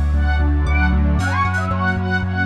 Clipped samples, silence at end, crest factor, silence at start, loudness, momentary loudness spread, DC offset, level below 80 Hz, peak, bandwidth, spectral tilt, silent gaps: under 0.1%; 0 s; 12 dB; 0 s; -18 LUFS; 2 LU; under 0.1%; -20 dBFS; -6 dBFS; 9 kHz; -7 dB/octave; none